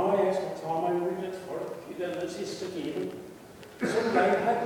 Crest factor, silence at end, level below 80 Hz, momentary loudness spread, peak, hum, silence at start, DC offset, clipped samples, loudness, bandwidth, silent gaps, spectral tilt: 18 dB; 0 s; -68 dBFS; 13 LU; -12 dBFS; none; 0 s; under 0.1%; under 0.1%; -30 LUFS; 19 kHz; none; -5.5 dB/octave